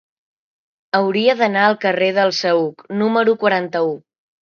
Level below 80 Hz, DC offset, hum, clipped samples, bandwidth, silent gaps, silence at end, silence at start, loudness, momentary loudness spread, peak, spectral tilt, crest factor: -70 dBFS; under 0.1%; none; under 0.1%; 7 kHz; none; 0.45 s; 0.95 s; -17 LUFS; 6 LU; 0 dBFS; -5 dB/octave; 18 dB